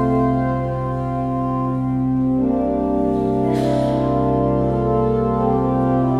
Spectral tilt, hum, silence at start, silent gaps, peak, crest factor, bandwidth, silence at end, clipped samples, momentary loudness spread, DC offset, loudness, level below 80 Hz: -9.5 dB/octave; none; 0 s; none; -6 dBFS; 12 dB; 9.4 kHz; 0 s; under 0.1%; 4 LU; under 0.1%; -19 LUFS; -34 dBFS